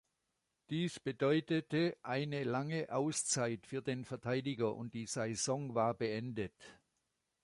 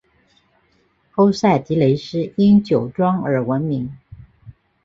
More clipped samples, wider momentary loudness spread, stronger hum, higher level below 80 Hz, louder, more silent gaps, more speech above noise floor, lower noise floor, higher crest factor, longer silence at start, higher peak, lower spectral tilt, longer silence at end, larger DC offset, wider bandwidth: neither; second, 7 LU vs 10 LU; neither; second, -74 dBFS vs -52 dBFS; second, -38 LUFS vs -18 LUFS; neither; first, 48 dB vs 44 dB; first, -85 dBFS vs -61 dBFS; about the same, 18 dB vs 16 dB; second, 0.7 s vs 1.15 s; second, -20 dBFS vs -2 dBFS; second, -4.5 dB/octave vs -8 dB/octave; first, 0.7 s vs 0.35 s; neither; first, 11.5 kHz vs 7.4 kHz